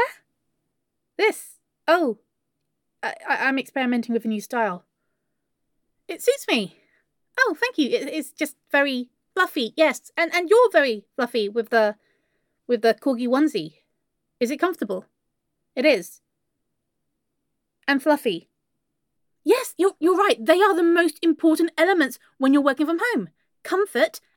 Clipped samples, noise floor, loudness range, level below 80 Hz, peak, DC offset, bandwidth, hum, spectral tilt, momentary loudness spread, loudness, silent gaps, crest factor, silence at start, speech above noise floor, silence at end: under 0.1%; -79 dBFS; 7 LU; -82 dBFS; -4 dBFS; under 0.1%; 17.5 kHz; none; -3.5 dB/octave; 13 LU; -22 LUFS; none; 20 dB; 0 s; 58 dB; 0.2 s